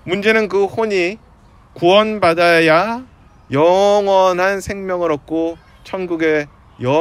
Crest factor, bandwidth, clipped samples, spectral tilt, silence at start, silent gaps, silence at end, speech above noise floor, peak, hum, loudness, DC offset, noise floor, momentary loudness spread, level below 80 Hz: 16 dB; 14.5 kHz; under 0.1%; -5 dB/octave; 0.05 s; none; 0 s; 31 dB; 0 dBFS; none; -15 LUFS; under 0.1%; -46 dBFS; 13 LU; -48 dBFS